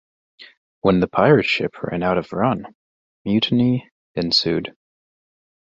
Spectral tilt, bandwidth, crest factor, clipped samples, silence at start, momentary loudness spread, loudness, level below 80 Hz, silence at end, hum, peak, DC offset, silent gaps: -6.5 dB/octave; 7.8 kHz; 20 dB; under 0.1%; 0.4 s; 12 LU; -19 LUFS; -50 dBFS; 0.95 s; none; -2 dBFS; under 0.1%; 0.57-0.82 s, 2.75-3.25 s, 3.92-4.14 s